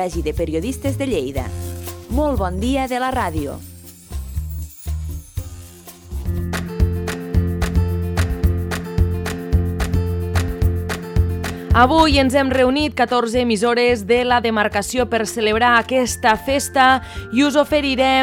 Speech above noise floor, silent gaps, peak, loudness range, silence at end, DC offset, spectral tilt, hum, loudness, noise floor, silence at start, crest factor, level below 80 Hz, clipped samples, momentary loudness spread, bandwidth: 22 dB; none; -2 dBFS; 10 LU; 0 s; under 0.1%; -5.5 dB/octave; none; -19 LUFS; -39 dBFS; 0 s; 18 dB; -28 dBFS; under 0.1%; 15 LU; over 20 kHz